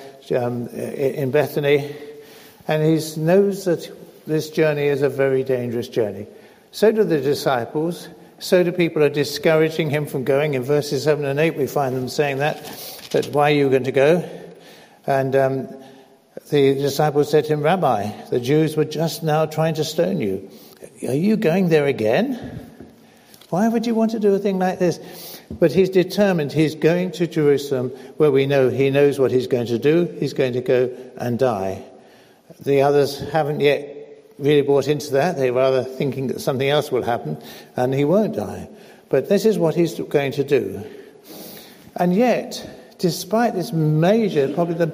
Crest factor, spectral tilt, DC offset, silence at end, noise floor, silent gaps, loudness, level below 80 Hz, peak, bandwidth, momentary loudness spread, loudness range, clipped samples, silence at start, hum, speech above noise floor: 16 dB; -6.5 dB/octave; under 0.1%; 0 s; -49 dBFS; none; -20 LUFS; -60 dBFS; -4 dBFS; 16 kHz; 15 LU; 3 LU; under 0.1%; 0 s; none; 30 dB